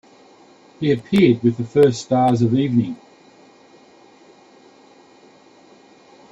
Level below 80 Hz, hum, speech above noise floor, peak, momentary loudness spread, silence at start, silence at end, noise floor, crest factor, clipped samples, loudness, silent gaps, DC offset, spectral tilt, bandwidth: -58 dBFS; none; 33 dB; -2 dBFS; 8 LU; 0.8 s; 3.35 s; -49 dBFS; 18 dB; under 0.1%; -18 LUFS; none; under 0.1%; -7.5 dB/octave; 11 kHz